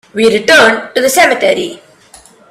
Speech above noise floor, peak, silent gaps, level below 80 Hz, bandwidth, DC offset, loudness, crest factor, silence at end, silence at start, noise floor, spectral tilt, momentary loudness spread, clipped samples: 31 dB; 0 dBFS; none; -50 dBFS; 16.5 kHz; under 0.1%; -9 LUFS; 12 dB; 0.75 s; 0.15 s; -41 dBFS; -2 dB/octave; 8 LU; 0.2%